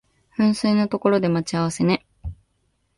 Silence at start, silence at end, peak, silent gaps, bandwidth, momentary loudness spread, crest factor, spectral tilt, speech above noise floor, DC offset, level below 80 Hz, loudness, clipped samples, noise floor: 0.4 s; 0.65 s; -4 dBFS; none; 11.5 kHz; 18 LU; 18 dB; -6 dB/octave; 49 dB; under 0.1%; -46 dBFS; -21 LUFS; under 0.1%; -68 dBFS